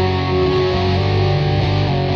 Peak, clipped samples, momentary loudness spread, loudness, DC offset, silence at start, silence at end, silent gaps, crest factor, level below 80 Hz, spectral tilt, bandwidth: -6 dBFS; under 0.1%; 1 LU; -17 LUFS; under 0.1%; 0 s; 0 s; none; 10 dB; -32 dBFS; -7.5 dB/octave; 6.6 kHz